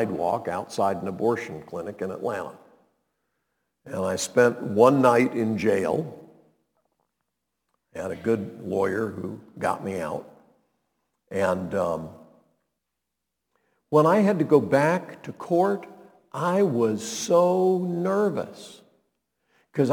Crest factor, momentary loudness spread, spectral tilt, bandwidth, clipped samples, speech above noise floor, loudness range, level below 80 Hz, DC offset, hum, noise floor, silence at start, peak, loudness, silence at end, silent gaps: 22 dB; 16 LU; -6 dB/octave; 19 kHz; under 0.1%; 59 dB; 9 LU; -68 dBFS; under 0.1%; none; -83 dBFS; 0 s; -4 dBFS; -24 LUFS; 0 s; none